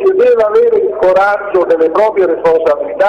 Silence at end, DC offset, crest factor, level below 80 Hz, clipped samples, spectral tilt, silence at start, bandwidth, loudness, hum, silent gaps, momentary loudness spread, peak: 0 s; under 0.1%; 8 dB; -48 dBFS; under 0.1%; -6 dB/octave; 0 s; 7 kHz; -10 LUFS; none; none; 3 LU; -2 dBFS